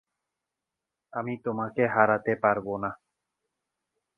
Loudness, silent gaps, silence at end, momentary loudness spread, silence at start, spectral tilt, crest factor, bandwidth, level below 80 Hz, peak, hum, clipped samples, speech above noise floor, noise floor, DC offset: -27 LUFS; none; 1.2 s; 12 LU; 1.15 s; -9.5 dB/octave; 26 dB; 3.7 kHz; -66 dBFS; -4 dBFS; none; under 0.1%; 61 dB; -87 dBFS; under 0.1%